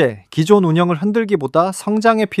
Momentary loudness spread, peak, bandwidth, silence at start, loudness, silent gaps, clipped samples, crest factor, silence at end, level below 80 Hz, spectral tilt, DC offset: 5 LU; 0 dBFS; 14 kHz; 0 s; -16 LUFS; none; under 0.1%; 14 dB; 0 s; -60 dBFS; -6.5 dB/octave; under 0.1%